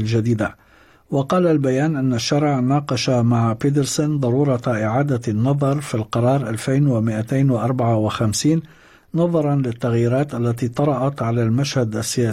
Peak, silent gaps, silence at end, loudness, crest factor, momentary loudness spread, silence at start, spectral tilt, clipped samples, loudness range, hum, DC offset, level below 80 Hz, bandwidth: -6 dBFS; none; 0 s; -19 LUFS; 12 dB; 4 LU; 0 s; -6.5 dB/octave; under 0.1%; 2 LU; none; under 0.1%; -52 dBFS; 14.5 kHz